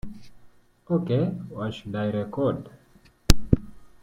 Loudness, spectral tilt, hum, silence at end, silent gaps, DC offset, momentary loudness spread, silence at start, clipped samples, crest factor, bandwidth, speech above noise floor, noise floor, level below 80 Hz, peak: -27 LUFS; -6 dB/octave; none; 0.15 s; none; under 0.1%; 14 LU; 0.05 s; under 0.1%; 26 dB; 16.5 kHz; 30 dB; -57 dBFS; -34 dBFS; 0 dBFS